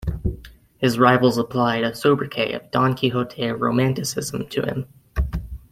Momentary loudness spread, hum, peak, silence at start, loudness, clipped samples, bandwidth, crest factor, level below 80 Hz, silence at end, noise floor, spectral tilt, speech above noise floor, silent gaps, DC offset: 12 LU; none; -2 dBFS; 0 s; -21 LUFS; under 0.1%; 16 kHz; 20 dB; -36 dBFS; 0.15 s; -42 dBFS; -5.5 dB/octave; 22 dB; none; under 0.1%